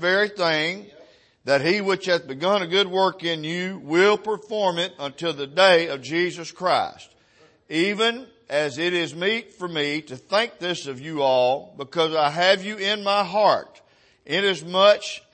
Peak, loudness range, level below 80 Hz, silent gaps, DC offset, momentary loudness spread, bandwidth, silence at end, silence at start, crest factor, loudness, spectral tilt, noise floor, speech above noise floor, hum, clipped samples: -4 dBFS; 3 LU; -72 dBFS; none; under 0.1%; 10 LU; 8.8 kHz; 0.15 s; 0 s; 20 dB; -22 LUFS; -4 dB/octave; -57 dBFS; 35 dB; none; under 0.1%